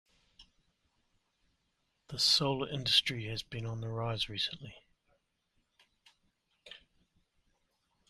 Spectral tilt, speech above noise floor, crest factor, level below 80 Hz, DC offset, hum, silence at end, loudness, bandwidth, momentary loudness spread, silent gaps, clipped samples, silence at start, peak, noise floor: -3.5 dB/octave; 46 dB; 26 dB; -64 dBFS; under 0.1%; none; 1.3 s; -31 LUFS; 14 kHz; 25 LU; none; under 0.1%; 0.4 s; -12 dBFS; -79 dBFS